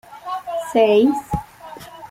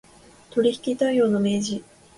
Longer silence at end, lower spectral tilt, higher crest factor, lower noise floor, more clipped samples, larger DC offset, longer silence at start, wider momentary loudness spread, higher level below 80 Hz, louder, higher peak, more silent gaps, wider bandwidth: second, 0.05 s vs 0.35 s; about the same, -6 dB/octave vs -5.5 dB/octave; about the same, 18 dB vs 14 dB; second, -39 dBFS vs -49 dBFS; neither; neither; second, 0.1 s vs 0.55 s; first, 23 LU vs 9 LU; first, -44 dBFS vs -62 dBFS; first, -19 LUFS vs -23 LUFS; first, -2 dBFS vs -8 dBFS; neither; first, 16 kHz vs 11.5 kHz